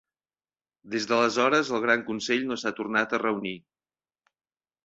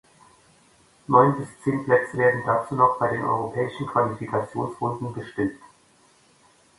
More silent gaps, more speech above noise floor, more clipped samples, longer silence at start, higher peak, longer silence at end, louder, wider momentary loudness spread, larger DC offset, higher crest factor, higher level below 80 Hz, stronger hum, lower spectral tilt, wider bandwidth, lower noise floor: neither; first, over 64 dB vs 35 dB; neither; second, 0.85 s vs 1.1 s; second, -8 dBFS vs -2 dBFS; about the same, 1.25 s vs 1.2 s; second, -26 LUFS vs -23 LUFS; about the same, 10 LU vs 10 LU; neither; about the same, 20 dB vs 22 dB; second, -72 dBFS vs -60 dBFS; neither; second, -3.5 dB/octave vs -7.5 dB/octave; second, 8 kHz vs 11.5 kHz; first, under -90 dBFS vs -58 dBFS